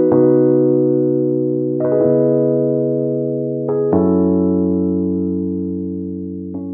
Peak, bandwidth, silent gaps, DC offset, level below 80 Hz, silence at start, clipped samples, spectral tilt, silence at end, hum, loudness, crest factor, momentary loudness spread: -2 dBFS; 2.1 kHz; none; under 0.1%; -54 dBFS; 0 s; under 0.1%; -16.5 dB/octave; 0 s; none; -16 LUFS; 12 dB; 10 LU